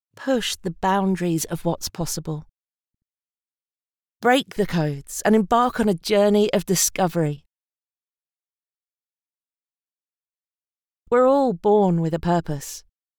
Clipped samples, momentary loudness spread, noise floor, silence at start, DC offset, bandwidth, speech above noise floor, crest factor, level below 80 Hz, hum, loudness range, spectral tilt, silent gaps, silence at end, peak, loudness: under 0.1%; 10 LU; under -90 dBFS; 0.2 s; under 0.1%; over 20 kHz; over 69 dB; 18 dB; -50 dBFS; none; 8 LU; -5 dB/octave; 3.30-3.34 s, 9.84-9.88 s, 10.78-10.83 s; 0.4 s; -6 dBFS; -21 LUFS